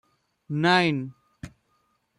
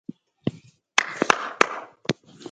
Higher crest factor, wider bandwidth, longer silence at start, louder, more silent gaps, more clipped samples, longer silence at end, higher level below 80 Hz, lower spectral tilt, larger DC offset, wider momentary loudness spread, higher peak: second, 20 dB vs 26 dB; about the same, 11.5 kHz vs 10.5 kHz; about the same, 0.5 s vs 0.45 s; about the same, -23 LUFS vs -25 LUFS; neither; neither; first, 0.7 s vs 0 s; about the same, -62 dBFS vs -64 dBFS; first, -6 dB/octave vs -3 dB/octave; neither; first, 25 LU vs 10 LU; second, -8 dBFS vs 0 dBFS